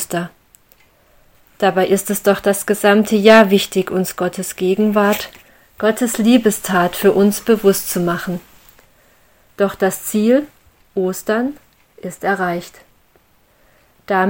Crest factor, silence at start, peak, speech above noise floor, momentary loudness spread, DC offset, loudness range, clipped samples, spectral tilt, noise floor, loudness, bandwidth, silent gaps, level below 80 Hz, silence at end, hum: 16 dB; 0 s; 0 dBFS; 39 dB; 11 LU; under 0.1%; 6 LU; under 0.1%; -4.5 dB/octave; -54 dBFS; -16 LUFS; 17 kHz; none; -54 dBFS; 0 s; none